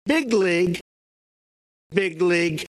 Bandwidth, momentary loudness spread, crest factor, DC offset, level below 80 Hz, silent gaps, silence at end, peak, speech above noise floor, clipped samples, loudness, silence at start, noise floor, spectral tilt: 13 kHz; 6 LU; 20 dB; under 0.1%; -60 dBFS; 0.81-1.90 s; 0.15 s; -4 dBFS; over 69 dB; under 0.1%; -21 LUFS; 0.05 s; under -90 dBFS; -5.5 dB/octave